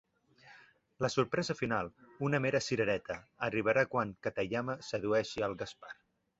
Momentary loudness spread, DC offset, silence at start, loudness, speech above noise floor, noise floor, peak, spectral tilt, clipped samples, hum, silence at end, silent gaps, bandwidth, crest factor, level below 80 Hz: 13 LU; under 0.1%; 0.45 s; -34 LUFS; 28 dB; -62 dBFS; -14 dBFS; -4.5 dB/octave; under 0.1%; none; 0.45 s; none; 8 kHz; 20 dB; -66 dBFS